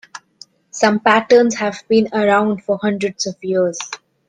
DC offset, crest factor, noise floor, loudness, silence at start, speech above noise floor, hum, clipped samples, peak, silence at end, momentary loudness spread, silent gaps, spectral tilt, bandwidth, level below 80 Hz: under 0.1%; 16 dB; -46 dBFS; -16 LUFS; 0.15 s; 30 dB; none; under 0.1%; 0 dBFS; 0.3 s; 13 LU; none; -4.5 dB/octave; 9.6 kHz; -60 dBFS